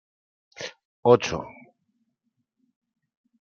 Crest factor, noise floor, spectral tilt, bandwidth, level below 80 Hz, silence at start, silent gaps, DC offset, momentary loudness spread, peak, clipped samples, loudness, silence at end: 26 dB; -77 dBFS; -5.5 dB/octave; 7.2 kHz; -62 dBFS; 0.6 s; 0.85-1.03 s; under 0.1%; 19 LU; -2 dBFS; under 0.1%; -22 LUFS; 2 s